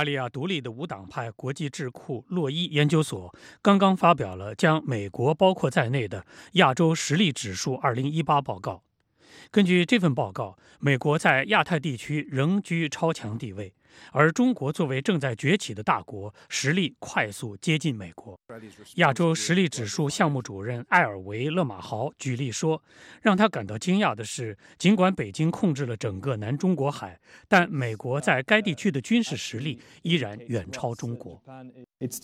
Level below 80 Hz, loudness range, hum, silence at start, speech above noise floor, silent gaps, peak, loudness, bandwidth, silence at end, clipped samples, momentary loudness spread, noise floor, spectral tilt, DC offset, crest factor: -66 dBFS; 4 LU; none; 0 s; 31 dB; none; -4 dBFS; -25 LUFS; 15 kHz; 0.05 s; under 0.1%; 14 LU; -57 dBFS; -5.5 dB/octave; under 0.1%; 22 dB